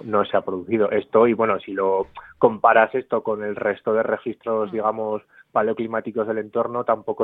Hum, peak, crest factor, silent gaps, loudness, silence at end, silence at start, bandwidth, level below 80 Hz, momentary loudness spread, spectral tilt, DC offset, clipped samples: none; -2 dBFS; 20 dB; none; -22 LUFS; 0 s; 0 s; 4 kHz; -62 dBFS; 8 LU; -9 dB/octave; under 0.1%; under 0.1%